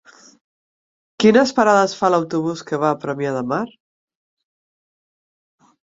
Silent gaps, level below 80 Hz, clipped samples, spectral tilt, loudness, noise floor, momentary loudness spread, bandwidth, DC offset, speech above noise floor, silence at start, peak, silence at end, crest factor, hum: none; -64 dBFS; under 0.1%; -5.5 dB/octave; -18 LUFS; under -90 dBFS; 10 LU; 7.8 kHz; under 0.1%; over 73 dB; 1.2 s; -2 dBFS; 2.15 s; 20 dB; none